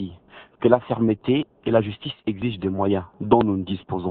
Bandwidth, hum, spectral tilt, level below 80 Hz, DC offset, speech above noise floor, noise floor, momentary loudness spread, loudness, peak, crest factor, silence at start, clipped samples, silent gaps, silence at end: 4.4 kHz; none; -11 dB/octave; -54 dBFS; under 0.1%; 25 dB; -47 dBFS; 9 LU; -23 LUFS; 0 dBFS; 22 dB; 0 s; under 0.1%; none; 0 s